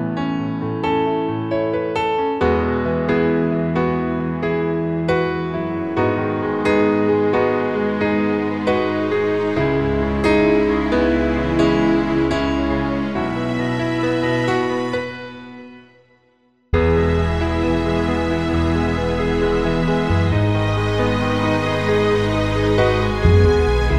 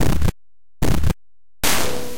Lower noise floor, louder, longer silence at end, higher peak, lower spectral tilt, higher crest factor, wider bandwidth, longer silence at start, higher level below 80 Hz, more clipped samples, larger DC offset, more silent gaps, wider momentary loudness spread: second, -59 dBFS vs -75 dBFS; first, -19 LUFS vs -22 LUFS; about the same, 0 s vs 0 s; about the same, -2 dBFS vs -4 dBFS; first, -7.5 dB/octave vs -4 dB/octave; about the same, 16 dB vs 16 dB; second, 11 kHz vs 17 kHz; about the same, 0 s vs 0 s; about the same, -30 dBFS vs -26 dBFS; neither; first, 0.4% vs under 0.1%; neither; about the same, 6 LU vs 7 LU